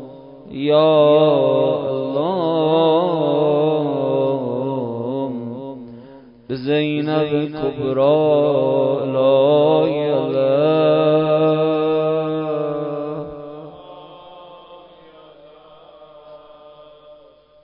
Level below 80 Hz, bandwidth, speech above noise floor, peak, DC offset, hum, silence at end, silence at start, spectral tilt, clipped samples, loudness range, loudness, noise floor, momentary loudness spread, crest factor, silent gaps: -60 dBFS; 5.4 kHz; 33 dB; -4 dBFS; under 0.1%; none; 0.5 s; 0 s; -12 dB/octave; under 0.1%; 9 LU; -17 LUFS; -48 dBFS; 16 LU; 14 dB; none